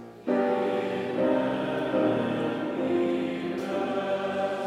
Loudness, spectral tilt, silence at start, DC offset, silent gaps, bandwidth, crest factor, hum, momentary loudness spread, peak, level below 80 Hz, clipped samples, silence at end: -28 LUFS; -7 dB/octave; 0 s; under 0.1%; none; 12.5 kHz; 14 dB; none; 4 LU; -12 dBFS; -66 dBFS; under 0.1%; 0 s